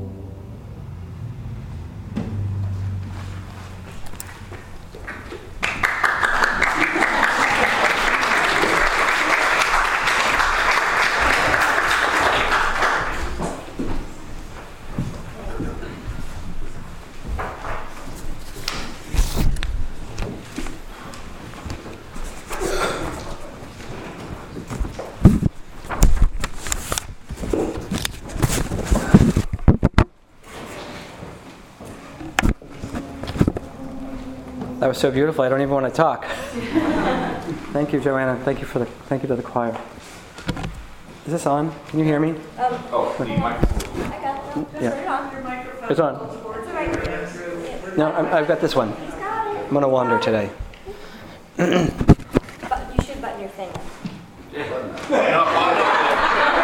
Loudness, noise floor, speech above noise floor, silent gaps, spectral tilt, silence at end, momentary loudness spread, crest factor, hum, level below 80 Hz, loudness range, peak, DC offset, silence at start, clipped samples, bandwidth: -21 LUFS; -44 dBFS; 23 dB; none; -5 dB/octave; 0 s; 20 LU; 22 dB; none; -30 dBFS; 13 LU; 0 dBFS; under 0.1%; 0 s; under 0.1%; 17 kHz